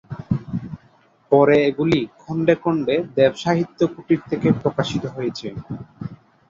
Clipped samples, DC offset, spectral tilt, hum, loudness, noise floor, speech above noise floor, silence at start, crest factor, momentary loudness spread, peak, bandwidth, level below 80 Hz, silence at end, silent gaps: under 0.1%; under 0.1%; -7 dB/octave; none; -20 LUFS; -56 dBFS; 36 dB; 0.1 s; 18 dB; 17 LU; -2 dBFS; 7.6 kHz; -50 dBFS; 0.35 s; none